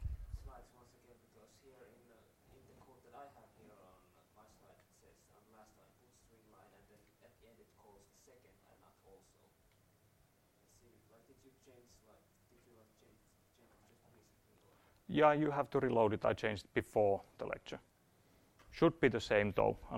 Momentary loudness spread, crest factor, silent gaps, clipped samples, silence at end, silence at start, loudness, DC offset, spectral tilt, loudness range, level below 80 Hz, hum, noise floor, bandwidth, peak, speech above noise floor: 26 LU; 26 dB; none; under 0.1%; 0 s; 0 s; -35 LUFS; under 0.1%; -6.5 dB/octave; 12 LU; -62 dBFS; none; -72 dBFS; 16.5 kHz; -16 dBFS; 37 dB